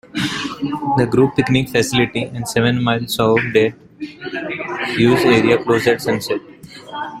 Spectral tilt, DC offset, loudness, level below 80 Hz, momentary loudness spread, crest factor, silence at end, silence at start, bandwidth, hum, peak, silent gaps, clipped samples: -5.5 dB/octave; under 0.1%; -17 LUFS; -48 dBFS; 14 LU; 16 dB; 0 s; 0.15 s; 16 kHz; none; 0 dBFS; none; under 0.1%